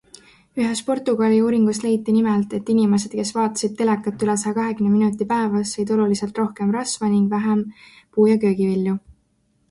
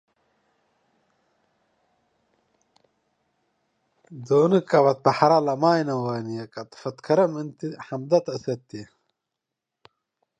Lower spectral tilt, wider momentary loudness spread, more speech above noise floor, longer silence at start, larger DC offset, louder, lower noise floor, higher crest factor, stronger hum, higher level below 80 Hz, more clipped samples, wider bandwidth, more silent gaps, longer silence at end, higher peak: about the same, -6 dB/octave vs -7 dB/octave; second, 6 LU vs 16 LU; second, 45 dB vs 62 dB; second, 0.55 s vs 4.1 s; neither; first, -20 LUFS vs -23 LUFS; second, -64 dBFS vs -85 dBFS; second, 14 dB vs 22 dB; neither; first, -60 dBFS vs -72 dBFS; neither; first, 11.5 kHz vs 9.6 kHz; neither; second, 0.7 s vs 1.55 s; about the same, -6 dBFS vs -4 dBFS